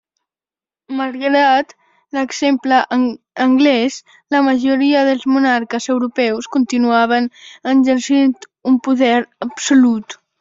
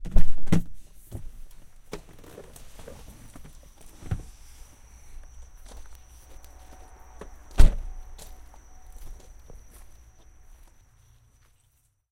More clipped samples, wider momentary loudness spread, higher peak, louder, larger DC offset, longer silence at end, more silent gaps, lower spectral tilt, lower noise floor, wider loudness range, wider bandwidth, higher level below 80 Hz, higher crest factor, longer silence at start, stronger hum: neither; second, 11 LU vs 25 LU; about the same, -2 dBFS vs -2 dBFS; first, -15 LUFS vs -32 LUFS; neither; second, 0.25 s vs 3 s; neither; second, -3.5 dB/octave vs -6 dB/octave; first, under -90 dBFS vs -67 dBFS; second, 1 LU vs 18 LU; second, 7.8 kHz vs 10.5 kHz; second, -62 dBFS vs -30 dBFS; second, 14 dB vs 22 dB; first, 0.9 s vs 0.05 s; neither